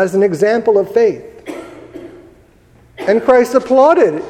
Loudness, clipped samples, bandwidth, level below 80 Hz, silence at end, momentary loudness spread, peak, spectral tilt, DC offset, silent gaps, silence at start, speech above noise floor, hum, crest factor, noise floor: -12 LUFS; under 0.1%; 15.5 kHz; -52 dBFS; 0 s; 23 LU; 0 dBFS; -6 dB/octave; under 0.1%; none; 0 s; 35 dB; none; 14 dB; -47 dBFS